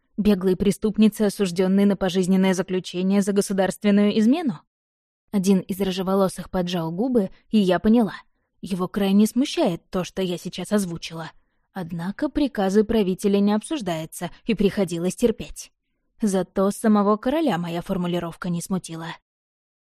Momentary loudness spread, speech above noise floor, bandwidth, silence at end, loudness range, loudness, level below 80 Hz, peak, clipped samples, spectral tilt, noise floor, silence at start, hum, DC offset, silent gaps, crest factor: 12 LU; over 68 dB; 14.5 kHz; 0.8 s; 4 LU; -22 LUFS; -48 dBFS; -6 dBFS; under 0.1%; -6 dB/octave; under -90 dBFS; 0.2 s; none; under 0.1%; 4.67-5.28 s; 16 dB